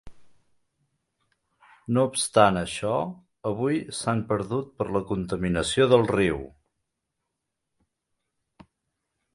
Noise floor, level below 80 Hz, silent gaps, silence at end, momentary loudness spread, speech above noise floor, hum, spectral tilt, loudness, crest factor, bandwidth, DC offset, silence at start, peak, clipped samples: -82 dBFS; -52 dBFS; none; 2.85 s; 12 LU; 58 dB; none; -5 dB/octave; -25 LUFS; 24 dB; 11.5 kHz; under 0.1%; 0.05 s; -2 dBFS; under 0.1%